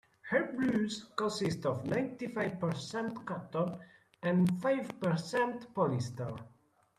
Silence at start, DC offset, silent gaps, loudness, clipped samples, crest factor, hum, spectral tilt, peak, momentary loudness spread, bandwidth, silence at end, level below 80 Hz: 0.25 s; under 0.1%; none; -34 LUFS; under 0.1%; 18 dB; none; -6.5 dB/octave; -18 dBFS; 9 LU; 13.5 kHz; 0.5 s; -70 dBFS